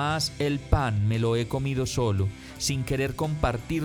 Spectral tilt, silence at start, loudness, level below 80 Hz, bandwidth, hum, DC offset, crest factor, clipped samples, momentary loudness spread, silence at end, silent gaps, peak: -5.5 dB/octave; 0 s; -27 LUFS; -38 dBFS; 18.5 kHz; none; under 0.1%; 18 dB; under 0.1%; 4 LU; 0 s; none; -8 dBFS